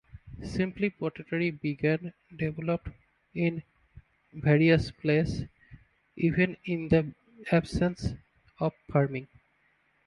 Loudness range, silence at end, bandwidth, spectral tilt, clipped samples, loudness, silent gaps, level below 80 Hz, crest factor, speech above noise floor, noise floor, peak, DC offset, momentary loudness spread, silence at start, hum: 5 LU; 0.8 s; 11 kHz; -8 dB/octave; under 0.1%; -29 LUFS; none; -50 dBFS; 20 dB; 41 dB; -69 dBFS; -10 dBFS; under 0.1%; 16 LU; 0.15 s; none